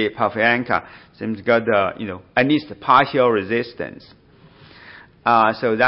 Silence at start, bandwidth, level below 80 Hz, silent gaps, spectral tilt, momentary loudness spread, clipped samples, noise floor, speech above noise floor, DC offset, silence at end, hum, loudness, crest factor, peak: 0 s; 5.8 kHz; -58 dBFS; none; -10.5 dB/octave; 14 LU; under 0.1%; -48 dBFS; 29 dB; under 0.1%; 0 s; none; -18 LUFS; 18 dB; -2 dBFS